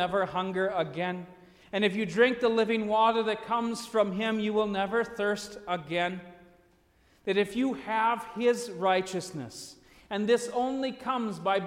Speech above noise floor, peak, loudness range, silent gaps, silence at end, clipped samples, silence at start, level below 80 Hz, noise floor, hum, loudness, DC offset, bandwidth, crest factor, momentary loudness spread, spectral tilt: 36 dB; -10 dBFS; 4 LU; none; 0 s; under 0.1%; 0 s; -66 dBFS; -64 dBFS; none; -29 LUFS; under 0.1%; 15.5 kHz; 18 dB; 11 LU; -5 dB/octave